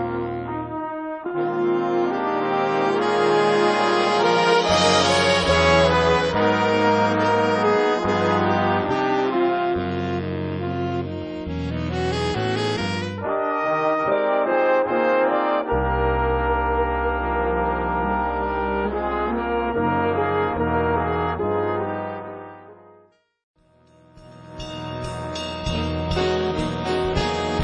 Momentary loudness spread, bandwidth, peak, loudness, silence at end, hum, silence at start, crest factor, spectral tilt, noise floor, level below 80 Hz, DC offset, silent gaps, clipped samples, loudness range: 11 LU; 10 kHz; -4 dBFS; -21 LUFS; 0 s; none; 0 s; 18 dB; -5.5 dB/octave; -56 dBFS; -38 dBFS; under 0.1%; 23.43-23.54 s; under 0.1%; 10 LU